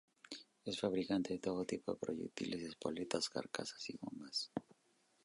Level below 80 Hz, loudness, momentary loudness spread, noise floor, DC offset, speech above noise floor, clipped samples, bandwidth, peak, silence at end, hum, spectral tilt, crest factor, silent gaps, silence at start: -76 dBFS; -42 LUFS; 10 LU; -76 dBFS; under 0.1%; 34 dB; under 0.1%; 11.5 kHz; -20 dBFS; 0.65 s; none; -4 dB/octave; 22 dB; none; 0.3 s